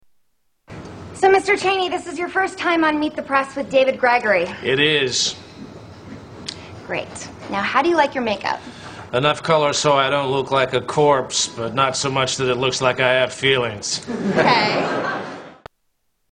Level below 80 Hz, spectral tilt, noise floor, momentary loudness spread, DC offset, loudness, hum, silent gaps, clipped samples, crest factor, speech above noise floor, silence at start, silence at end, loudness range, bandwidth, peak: -54 dBFS; -3.5 dB/octave; -68 dBFS; 19 LU; under 0.1%; -19 LUFS; none; none; under 0.1%; 20 dB; 49 dB; 0.7 s; 0.8 s; 4 LU; 10.5 kHz; 0 dBFS